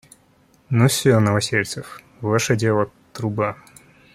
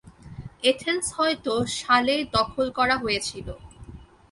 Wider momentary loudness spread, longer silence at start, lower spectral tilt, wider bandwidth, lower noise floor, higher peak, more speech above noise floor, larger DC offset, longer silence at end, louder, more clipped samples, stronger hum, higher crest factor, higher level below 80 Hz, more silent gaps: second, 13 LU vs 20 LU; first, 0.7 s vs 0.05 s; first, -5 dB/octave vs -3 dB/octave; first, 15.5 kHz vs 11.5 kHz; first, -57 dBFS vs -45 dBFS; about the same, -4 dBFS vs -6 dBFS; first, 37 dB vs 21 dB; neither; first, 0.6 s vs 0.25 s; first, -20 LUFS vs -24 LUFS; neither; neither; about the same, 18 dB vs 20 dB; second, -56 dBFS vs -48 dBFS; neither